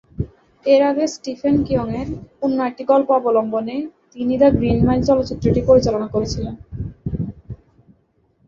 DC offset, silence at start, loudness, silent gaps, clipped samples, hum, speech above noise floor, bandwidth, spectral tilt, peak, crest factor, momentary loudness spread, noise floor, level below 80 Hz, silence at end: under 0.1%; 0.2 s; -18 LUFS; none; under 0.1%; none; 44 dB; 7.6 kHz; -7.5 dB/octave; -2 dBFS; 16 dB; 15 LU; -61 dBFS; -36 dBFS; 0.9 s